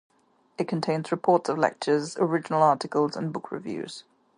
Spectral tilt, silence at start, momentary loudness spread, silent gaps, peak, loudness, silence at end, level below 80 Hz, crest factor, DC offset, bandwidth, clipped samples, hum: -6 dB/octave; 0.6 s; 13 LU; none; -8 dBFS; -26 LUFS; 0.35 s; -74 dBFS; 20 dB; under 0.1%; 10.5 kHz; under 0.1%; none